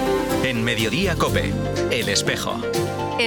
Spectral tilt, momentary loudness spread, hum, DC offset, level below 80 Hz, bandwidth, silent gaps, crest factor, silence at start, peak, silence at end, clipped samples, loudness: -4 dB/octave; 4 LU; none; under 0.1%; -38 dBFS; 19 kHz; none; 16 dB; 0 s; -6 dBFS; 0 s; under 0.1%; -21 LUFS